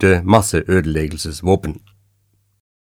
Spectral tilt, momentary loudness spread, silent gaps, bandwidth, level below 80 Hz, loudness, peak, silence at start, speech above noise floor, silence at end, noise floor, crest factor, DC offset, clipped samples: -5.5 dB/octave; 12 LU; none; 17.5 kHz; -34 dBFS; -17 LUFS; 0 dBFS; 0 s; 46 dB; 1.1 s; -62 dBFS; 18 dB; under 0.1%; under 0.1%